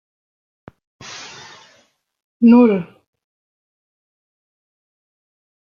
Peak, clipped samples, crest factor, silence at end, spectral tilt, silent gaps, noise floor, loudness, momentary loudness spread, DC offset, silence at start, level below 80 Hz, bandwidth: -2 dBFS; under 0.1%; 20 dB; 2.95 s; -7 dB/octave; 2.22-2.40 s; -58 dBFS; -13 LUFS; 26 LU; under 0.1%; 1.1 s; -66 dBFS; 7.2 kHz